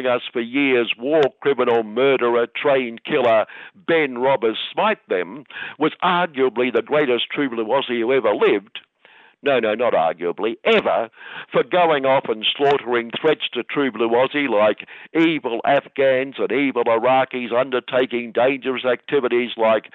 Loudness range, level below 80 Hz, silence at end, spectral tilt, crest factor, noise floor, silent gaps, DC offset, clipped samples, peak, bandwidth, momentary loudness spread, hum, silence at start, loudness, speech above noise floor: 2 LU; -70 dBFS; 0.15 s; -7 dB/octave; 14 dB; -51 dBFS; none; under 0.1%; under 0.1%; -6 dBFS; 5.8 kHz; 6 LU; none; 0 s; -19 LUFS; 32 dB